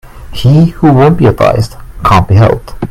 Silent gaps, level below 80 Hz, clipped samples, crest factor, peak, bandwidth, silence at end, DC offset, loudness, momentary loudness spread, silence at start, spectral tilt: none; -26 dBFS; 0.5%; 8 dB; 0 dBFS; 15 kHz; 0 s; under 0.1%; -8 LUFS; 10 LU; 0.05 s; -8 dB/octave